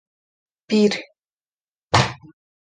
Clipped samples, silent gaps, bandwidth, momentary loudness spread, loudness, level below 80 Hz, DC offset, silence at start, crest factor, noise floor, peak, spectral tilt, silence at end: under 0.1%; 1.33-1.37 s, 1.53-1.57 s, 1.63-1.67 s, 1.78-1.88 s; 9.8 kHz; 10 LU; -20 LUFS; -46 dBFS; under 0.1%; 0.7 s; 22 dB; under -90 dBFS; -2 dBFS; -5 dB/octave; 0.55 s